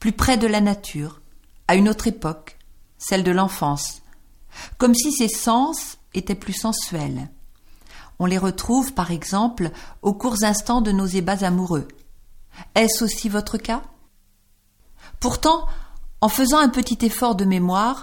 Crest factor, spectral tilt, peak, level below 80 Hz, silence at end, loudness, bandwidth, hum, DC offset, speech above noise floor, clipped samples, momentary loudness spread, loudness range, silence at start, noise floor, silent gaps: 18 dB; -4.5 dB/octave; -2 dBFS; -36 dBFS; 0 s; -21 LUFS; 17.5 kHz; none; under 0.1%; 38 dB; under 0.1%; 12 LU; 4 LU; 0 s; -58 dBFS; none